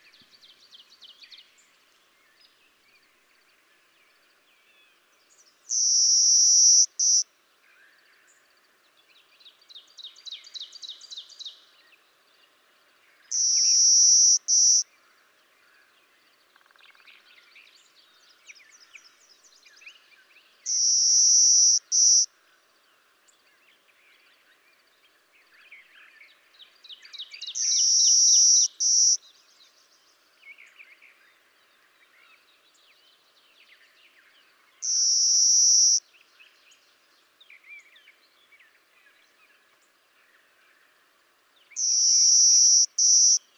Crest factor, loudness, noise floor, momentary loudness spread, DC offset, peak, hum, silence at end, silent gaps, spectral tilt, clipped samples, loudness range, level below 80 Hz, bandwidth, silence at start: 20 dB; -17 LUFS; -64 dBFS; 25 LU; under 0.1%; -6 dBFS; none; 0.2 s; none; 8 dB/octave; under 0.1%; 22 LU; under -90 dBFS; 19 kHz; 5.7 s